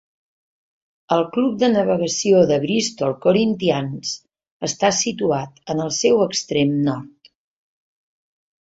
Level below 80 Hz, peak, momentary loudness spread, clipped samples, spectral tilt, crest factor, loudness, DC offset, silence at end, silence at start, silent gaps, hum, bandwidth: -60 dBFS; -2 dBFS; 10 LU; under 0.1%; -4.5 dB/octave; 18 dB; -19 LUFS; under 0.1%; 1.55 s; 1.1 s; 4.51-4.60 s; none; 8 kHz